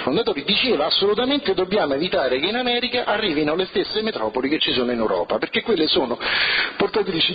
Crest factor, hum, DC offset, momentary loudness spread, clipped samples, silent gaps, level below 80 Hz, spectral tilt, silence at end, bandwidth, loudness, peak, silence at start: 14 dB; none; under 0.1%; 4 LU; under 0.1%; none; -52 dBFS; -8 dB/octave; 0 s; 5 kHz; -20 LUFS; -6 dBFS; 0 s